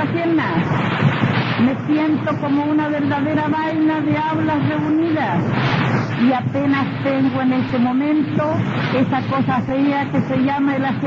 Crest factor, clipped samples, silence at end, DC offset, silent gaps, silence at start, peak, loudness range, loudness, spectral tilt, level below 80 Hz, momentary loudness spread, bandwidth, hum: 14 dB; under 0.1%; 0 s; under 0.1%; none; 0 s; -4 dBFS; 0 LU; -18 LUFS; -8.5 dB/octave; -52 dBFS; 2 LU; 7.2 kHz; none